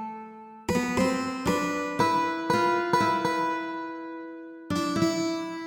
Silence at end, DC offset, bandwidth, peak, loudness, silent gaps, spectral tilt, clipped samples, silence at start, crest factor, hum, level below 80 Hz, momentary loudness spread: 0 s; under 0.1%; 18.5 kHz; -10 dBFS; -27 LUFS; none; -5 dB/octave; under 0.1%; 0 s; 18 dB; none; -56 dBFS; 15 LU